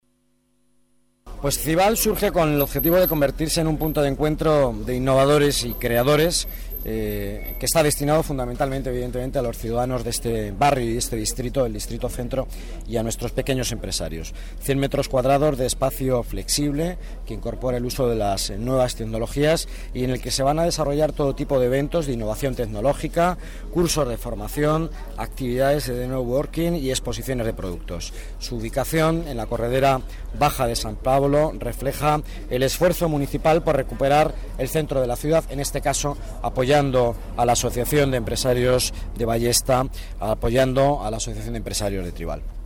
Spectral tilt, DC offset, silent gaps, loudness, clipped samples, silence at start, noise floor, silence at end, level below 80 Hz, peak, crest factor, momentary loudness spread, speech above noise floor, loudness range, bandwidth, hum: -5 dB/octave; under 0.1%; none; -22 LUFS; under 0.1%; 1.25 s; -66 dBFS; 0 s; -32 dBFS; -8 dBFS; 14 dB; 10 LU; 44 dB; 4 LU; 17.5 kHz; none